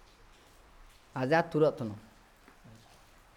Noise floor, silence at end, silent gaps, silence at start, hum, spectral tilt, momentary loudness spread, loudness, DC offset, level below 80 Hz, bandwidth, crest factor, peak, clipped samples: -59 dBFS; 1.35 s; none; 1.15 s; none; -7 dB/octave; 16 LU; -30 LUFS; under 0.1%; -62 dBFS; 15 kHz; 20 dB; -14 dBFS; under 0.1%